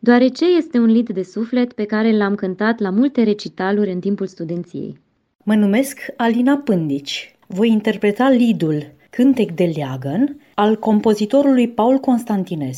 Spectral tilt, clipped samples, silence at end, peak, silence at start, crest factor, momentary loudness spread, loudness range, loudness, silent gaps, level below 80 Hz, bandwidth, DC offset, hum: -6.5 dB/octave; under 0.1%; 0 s; 0 dBFS; 0.05 s; 16 dB; 10 LU; 3 LU; -17 LUFS; 5.35-5.39 s; -62 dBFS; 14 kHz; under 0.1%; none